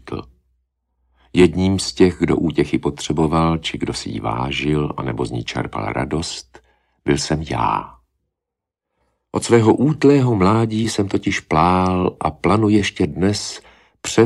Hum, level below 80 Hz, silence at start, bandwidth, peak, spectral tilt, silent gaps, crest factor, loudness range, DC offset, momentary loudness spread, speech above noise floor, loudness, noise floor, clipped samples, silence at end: none; -40 dBFS; 0.05 s; 12.5 kHz; 0 dBFS; -6 dB/octave; none; 18 dB; 7 LU; under 0.1%; 10 LU; 66 dB; -18 LUFS; -83 dBFS; under 0.1%; 0 s